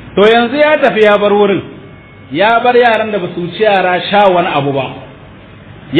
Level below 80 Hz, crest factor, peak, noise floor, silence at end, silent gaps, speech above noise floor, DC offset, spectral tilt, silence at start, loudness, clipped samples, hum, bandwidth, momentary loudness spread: -46 dBFS; 12 dB; 0 dBFS; -35 dBFS; 0 s; none; 25 dB; under 0.1%; -7 dB/octave; 0 s; -10 LUFS; 0.2%; none; 7.4 kHz; 11 LU